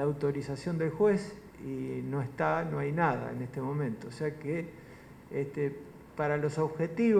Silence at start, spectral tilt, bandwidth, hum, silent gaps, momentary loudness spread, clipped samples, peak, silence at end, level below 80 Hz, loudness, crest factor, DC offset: 0 s; -8 dB/octave; 14 kHz; none; none; 16 LU; under 0.1%; -14 dBFS; 0 s; -62 dBFS; -33 LUFS; 18 dB; under 0.1%